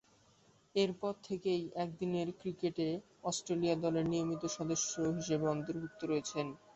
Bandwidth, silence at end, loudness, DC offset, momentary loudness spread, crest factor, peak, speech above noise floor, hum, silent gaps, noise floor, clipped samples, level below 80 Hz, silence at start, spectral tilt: 8 kHz; 0.2 s; -37 LUFS; under 0.1%; 7 LU; 16 dB; -20 dBFS; 32 dB; none; none; -68 dBFS; under 0.1%; -70 dBFS; 0.75 s; -6 dB/octave